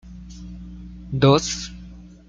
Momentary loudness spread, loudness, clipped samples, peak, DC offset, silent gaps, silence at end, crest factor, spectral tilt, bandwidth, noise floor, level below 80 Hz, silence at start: 24 LU; -20 LUFS; under 0.1%; -2 dBFS; under 0.1%; none; 0.2 s; 22 dB; -5.5 dB/octave; 7.8 kHz; -42 dBFS; -42 dBFS; 0.05 s